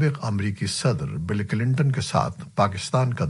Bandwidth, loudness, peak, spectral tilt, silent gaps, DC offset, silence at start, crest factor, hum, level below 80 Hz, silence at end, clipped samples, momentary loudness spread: 11.5 kHz; -24 LUFS; -6 dBFS; -6 dB/octave; none; under 0.1%; 0 s; 18 dB; none; -50 dBFS; 0 s; under 0.1%; 5 LU